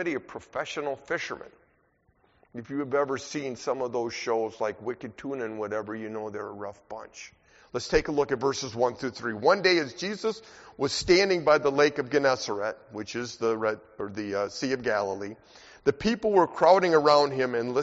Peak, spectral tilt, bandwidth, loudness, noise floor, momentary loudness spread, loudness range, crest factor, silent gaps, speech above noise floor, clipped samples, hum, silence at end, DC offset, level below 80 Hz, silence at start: -6 dBFS; -3 dB/octave; 8 kHz; -27 LUFS; -67 dBFS; 16 LU; 9 LU; 22 dB; none; 40 dB; under 0.1%; none; 0 s; under 0.1%; -56 dBFS; 0 s